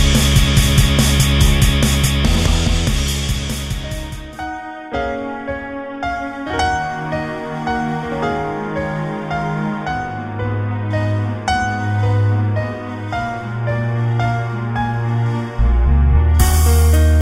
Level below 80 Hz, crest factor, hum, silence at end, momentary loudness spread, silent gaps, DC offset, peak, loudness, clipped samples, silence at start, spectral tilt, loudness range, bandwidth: -20 dBFS; 16 dB; none; 0 s; 11 LU; none; 0.2%; 0 dBFS; -18 LUFS; under 0.1%; 0 s; -5 dB/octave; 7 LU; 16 kHz